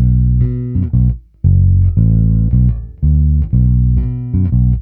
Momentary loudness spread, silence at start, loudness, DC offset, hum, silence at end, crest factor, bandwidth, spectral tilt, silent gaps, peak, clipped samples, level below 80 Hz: 5 LU; 0 s; -14 LUFS; under 0.1%; none; 0 s; 10 dB; 2 kHz; -15 dB/octave; none; 0 dBFS; under 0.1%; -16 dBFS